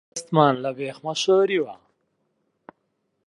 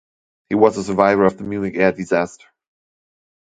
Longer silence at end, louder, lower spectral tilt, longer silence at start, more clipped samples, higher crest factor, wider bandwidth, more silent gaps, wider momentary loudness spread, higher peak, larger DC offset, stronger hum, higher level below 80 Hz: first, 1.5 s vs 1.1 s; second, -22 LUFS vs -18 LUFS; second, -5 dB/octave vs -6.5 dB/octave; second, 0.15 s vs 0.5 s; neither; about the same, 20 dB vs 20 dB; first, 11 kHz vs 9.2 kHz; neither; about the same, 11 LU vs 9 LU; second, -4 dBFS vs 0 dBFS; neither; neither; second, -74 dBFS vs -54 dBFS